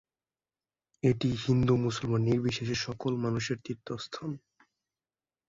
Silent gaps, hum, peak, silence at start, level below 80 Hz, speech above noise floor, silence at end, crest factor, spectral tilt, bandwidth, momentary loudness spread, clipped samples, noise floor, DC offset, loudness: none; none; -14 dBFS; 1.05 s; -56 dBFS; over 60 dB; 1.1 s; 18 dB; -6.5 dB/octave; 7.8 kHz; 12 LU; under 0.1%; under -90 dBFS; under 0.1%; -31 LUFS